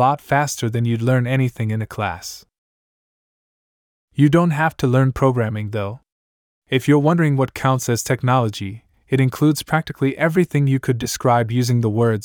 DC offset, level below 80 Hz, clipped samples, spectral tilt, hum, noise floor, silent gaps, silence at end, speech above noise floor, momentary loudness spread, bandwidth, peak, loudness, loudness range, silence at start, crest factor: under 0.1%; -50 dBFS; under 0.1%; -6.5 dB/octave; none; under -90 dBFS; 2.58-4.08 s, 6.12-6.62 s; 0 s; over 72 dB; 9 LU; 19 kHz; -2 dBFS; -19 LUFS; 4 LU; 0 s; 16 dB